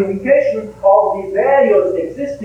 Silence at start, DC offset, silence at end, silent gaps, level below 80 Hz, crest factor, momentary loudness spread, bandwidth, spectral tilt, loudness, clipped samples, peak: 0 s; under 0.1%; 0 s; none; -48 dBFS; 14 dB; 8 LU; 7.2 kHz; -7.5 dB/octave; -14 LUFS; under 0.1%; 0 dBFS